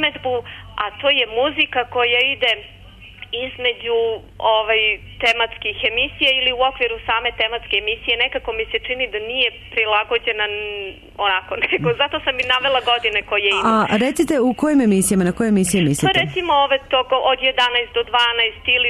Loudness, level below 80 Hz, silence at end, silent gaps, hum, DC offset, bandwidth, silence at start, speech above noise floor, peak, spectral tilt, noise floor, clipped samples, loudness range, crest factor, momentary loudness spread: -18 LUFS; -44 dBFS; 0 s; none; none; under 0.1%; 13.5 kHz; 0 s; 21 dB; -6 dBFS; -3.5 dB/octave; -39 dBFS; under 0.1%; 3 LU; 14 dB; 7 LU